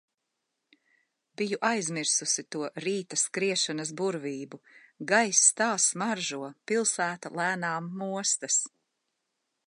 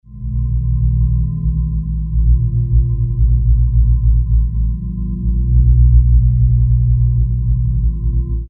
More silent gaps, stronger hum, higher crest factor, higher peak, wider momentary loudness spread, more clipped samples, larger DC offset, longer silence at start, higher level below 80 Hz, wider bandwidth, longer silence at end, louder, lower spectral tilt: neither; neither; first, 22 dB vs 12 dB; second, -8 dBFS vs 0 dBFS; first, 13 LU vs 8 LU; neither; neither; first, 1.4 s vs 0.1 s; second, -84 dBFS vs -14 dBFS; first, 11.5 kHz vs 1.1 kHz; first, 1 s vs 0 s; second, -27 LUFS vs -16 LUFS; second, -2 dB/octave vs -15 dB/octave